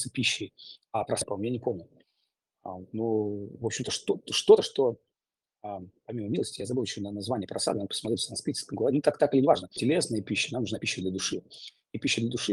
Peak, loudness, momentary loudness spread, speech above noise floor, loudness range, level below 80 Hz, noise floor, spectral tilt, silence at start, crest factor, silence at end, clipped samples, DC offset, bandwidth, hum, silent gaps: -6 dBFS; -28 LUFS; 16 LU; over 61 dB; 6 LU; -68 dBFS; under -90 dBFS; -4 dB/octave; 0 s; 22 dB; 0 s; under 0.1%; under 0.1%; 12.5 kHz; none; none